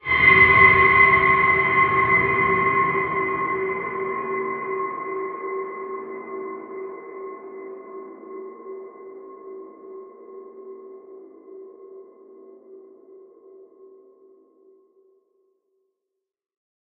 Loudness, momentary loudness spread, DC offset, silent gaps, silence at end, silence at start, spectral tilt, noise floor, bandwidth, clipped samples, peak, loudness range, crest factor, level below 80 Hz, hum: -17 LUFS; 28 LU; under 0.1%; none; 4.05 s; 0.05 s; -2.5 dB/octave; -83 dBFS; 5.2 kHz; under 0.1%; -2 dBFS; 27 LU; 22 dB; -50 dBFS; none